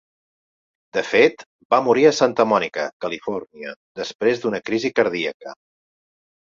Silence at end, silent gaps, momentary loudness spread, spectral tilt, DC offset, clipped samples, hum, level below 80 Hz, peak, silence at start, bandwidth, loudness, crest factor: 0.95 s; 1.46-1.59 s, 1.65-1.70 s, 2.93-3.00 s, 3.76-3.95 s, 4.15-4.19 s, 5.34-5.40 s; 16 LU; -4.5 dB/octave; under 0.1%; under 0.1%; none; -66 dBFS; -2 dBFS; 0.95 s; 7.6 kHz; -20 LUFS; 20 dB